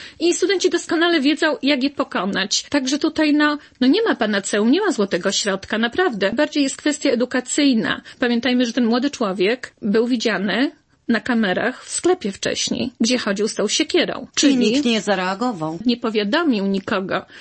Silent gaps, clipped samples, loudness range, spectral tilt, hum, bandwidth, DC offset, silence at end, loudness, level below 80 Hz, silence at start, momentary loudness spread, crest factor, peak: none; under 0.1%; 2 LU; -3.5 dB/octave; none; 8.8 kHz; under 0.1%; 0 s; -19 LUFS; -58 dBFS; 0 s; 5 LU; 16 dB; -4 dBFS